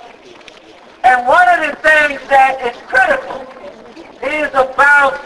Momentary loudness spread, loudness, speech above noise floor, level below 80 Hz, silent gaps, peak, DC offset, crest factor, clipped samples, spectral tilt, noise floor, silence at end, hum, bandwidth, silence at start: 13 LU; -11 LUFS; 28 dB; -48 dBFS; none; 0 dBFS; under 0.1%; 14 dB; under 0.1%; -2.5 dB/octave; -40 dBFS; 0 s; none; 11 kHz; 0 s